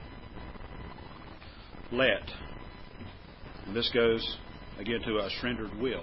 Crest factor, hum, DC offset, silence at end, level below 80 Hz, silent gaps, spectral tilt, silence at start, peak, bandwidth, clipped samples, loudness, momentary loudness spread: 24 dB; none; under 0.1%; 0 s; -50 dBFS; none; -8.5 dB/octave; 0 s; -10 dBFS; 5.8 kHz; under 0.1%; -31 LUFS; 21 LU